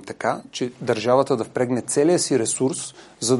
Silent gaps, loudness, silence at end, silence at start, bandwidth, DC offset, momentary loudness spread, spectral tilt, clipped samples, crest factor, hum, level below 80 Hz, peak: none; -22 LUFS; 0 s; 0.05 s; 11.5 kHz; under 0.1%; 9 LU; -4 dB/octave; under 0.1%; 16 dB; none; -64 dBFS; -4 dBFS